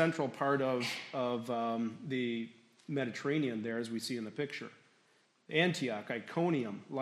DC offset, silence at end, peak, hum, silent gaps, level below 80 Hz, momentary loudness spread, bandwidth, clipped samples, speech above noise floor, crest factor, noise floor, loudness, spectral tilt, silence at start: under 0.1%; 0 s; -14 dBFS; none; none; -84 dBFS; 9 LU; 14 kHz; under 0.1%; 36 dB; 22 dB; -71 dBFS; -36 LUFS; -5.5 dB/octave; 0 s